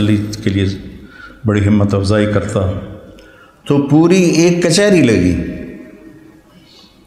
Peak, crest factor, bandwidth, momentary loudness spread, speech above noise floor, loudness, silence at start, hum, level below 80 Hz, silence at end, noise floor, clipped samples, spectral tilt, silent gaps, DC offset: 0 dBFS; 14 dB; 13 kHz; 19 LU; 31 dB; -13 LUFS; 0 s; none; -38 dBFS; 1 s; -43 dBFS; under 0.1%; -6 dB/octave; none; under 0.1%